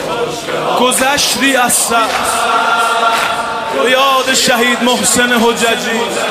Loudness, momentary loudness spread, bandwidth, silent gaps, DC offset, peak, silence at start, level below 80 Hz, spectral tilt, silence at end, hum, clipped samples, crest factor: -11 LUFS; 6 LU; 15.5 kHz; none; under 0.1%; 0 dBFS; 0 s; -48 dBFS; -1.5 dB/octave; 0 s; none; under 0.1%; 12 dB